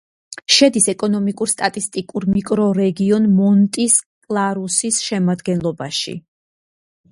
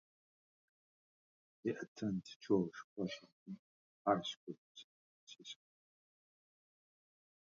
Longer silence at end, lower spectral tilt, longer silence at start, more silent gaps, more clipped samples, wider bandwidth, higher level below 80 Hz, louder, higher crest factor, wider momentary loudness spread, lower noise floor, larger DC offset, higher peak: second, 0.95 s vs 1.85 s; about the same, -4 dB/octave vs -5 dB/octave; second, 0.3 s vs 1.65 s; second, 4.06-4.21 s vs 1.88-1.95 s, 2.36-2.40 s, 2.84-2.96 s, 3.32-3.46 s, 3.59-4.05 s, 4.37-4.47 s, 4.58-4.75 s, 4.84-5.27 s; neither; first, 11.5 kHz vs 7.2 kHz; first, -54 dBFS vs -80 dBFS; first, -17 LUFS vs -41 LUFS; second, 18 dB vs 24 dB; second, 10 LU vs 19 LU; about the same, under -90 dBFS vs under -90 dBFS; neither; first, 0 dBFS vs -20 dBFS